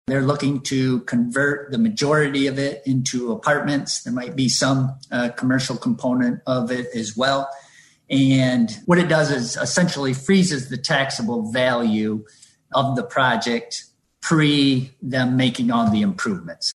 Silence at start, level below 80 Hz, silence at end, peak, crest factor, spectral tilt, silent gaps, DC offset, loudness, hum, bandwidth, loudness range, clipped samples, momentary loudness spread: 0.1 s; -58 dBFS; 0.05 s; -4 dBFS; 16 dB; -5 dB/octave; none; under 0.1%; -20 LUFS; none; 12 kHz; 2 LU; under 0.1%; 7 LU